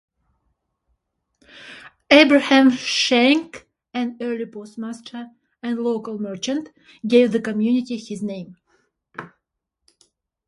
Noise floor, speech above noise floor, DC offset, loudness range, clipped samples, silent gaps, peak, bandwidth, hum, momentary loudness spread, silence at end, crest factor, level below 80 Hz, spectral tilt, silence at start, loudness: -79 dBFS; 60 dB; under 0.1%; 10 LU; under 0.1%; none; 0 dBFS; 11.5 kHz; none; 25 LU; 1.2 s; 22 dB; -66 dBFS; -4 dB/octave; 1.6 s; -19 LUFS